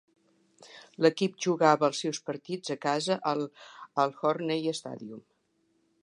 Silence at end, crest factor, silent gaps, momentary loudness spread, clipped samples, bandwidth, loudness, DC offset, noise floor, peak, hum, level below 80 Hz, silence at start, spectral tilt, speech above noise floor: 0.85 s; 24 dB; none; 18 LU; under 0.1%; 11.5 kHz; -29 LUFS; under 0.1%; -73 dBFS; -8 dBFS; none; -84 dBFS; 0.6 s; -4.5 dB/octave; 44 dB